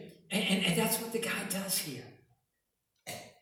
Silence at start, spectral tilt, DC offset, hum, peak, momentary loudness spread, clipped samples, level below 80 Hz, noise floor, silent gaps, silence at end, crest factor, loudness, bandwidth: 0 s; -3 dB/octave; under 0.1%; none; -16 dBFS; 16 LU; under 0.1%; -70 dBFS; -83 dBFS; none; 0.1 s; 20 dB; -32 LUFS; 19.5 kHz